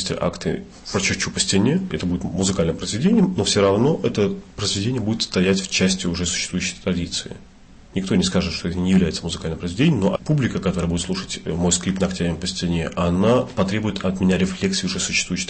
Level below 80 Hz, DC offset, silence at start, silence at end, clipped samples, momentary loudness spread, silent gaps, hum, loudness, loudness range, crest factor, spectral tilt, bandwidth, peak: -42 dBFS; under 0.1%; 0 s; 0 s; under 0.1%; 8 LU; none; none; -21 LUFS; 3 LU; 16 dB; -4.5 dB/octave; 8.8 kHz; -6 dBFS